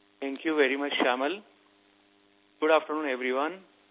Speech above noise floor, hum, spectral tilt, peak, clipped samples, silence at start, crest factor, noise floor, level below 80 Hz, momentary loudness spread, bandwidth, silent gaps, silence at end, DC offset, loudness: 37 dB; none; 0 dB/octave; -10 dBFS; under 0.1%; 0.2 s; 20 dB; -64 dBFS; -90 dBFS; 10 LU; 4 kHz; none; 0.3 s; under 0.1%; -28 LUFS